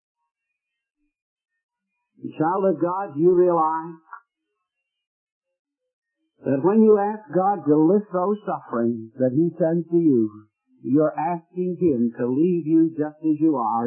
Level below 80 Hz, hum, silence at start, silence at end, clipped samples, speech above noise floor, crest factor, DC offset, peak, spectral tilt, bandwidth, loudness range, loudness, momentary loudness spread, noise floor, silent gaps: -72 dBFS; none; 2.2 s; 0 s; under 0.1%; 62 dB; 16 dB; under 0.1%; -6 dBFS; -14 dB/octave; 3 kHz; 4 LU; -21 LUFS; 10 LU; -82 dBFS; 5.07-5.41 s, 5.59-5.65 s, 5.93-6.02 s